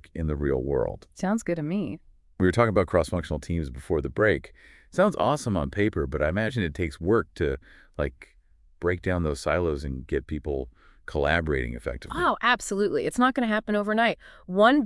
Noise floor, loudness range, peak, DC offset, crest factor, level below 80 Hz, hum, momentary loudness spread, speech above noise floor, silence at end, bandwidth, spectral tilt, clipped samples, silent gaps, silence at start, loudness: -54 dBFS; 4 LU; -6 dBFS; under 0.1%; 20 dB; -42 dBFS; none; 10 LU; 29 dB; 0 s; 12 kHz; -6 dB/octave; under 0.1%; none; 0.15 s; -26 LUFS